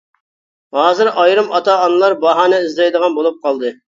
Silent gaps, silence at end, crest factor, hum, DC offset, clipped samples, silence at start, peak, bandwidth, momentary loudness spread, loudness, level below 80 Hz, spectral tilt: none; 0.25 s; 14 dB; none; under 0.1%; under 0.1%; 0.75 s; 0 dBFS; 7.6 kHz; 7 LU; -13 LUFS; -68 dBFS; -4 dB/octave